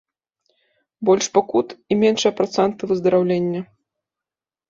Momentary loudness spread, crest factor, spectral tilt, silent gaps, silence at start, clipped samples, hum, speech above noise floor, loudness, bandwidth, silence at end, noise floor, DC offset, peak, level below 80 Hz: 8 LU; 18 dB; -5 dB/octave; none; 1 s; under 0.1%; none; 71 dB; -19 LUFS; 7.6 kHz; 1.05 s; -90 dBFS; under 0.1%; -2 dBFS; -62 dBFS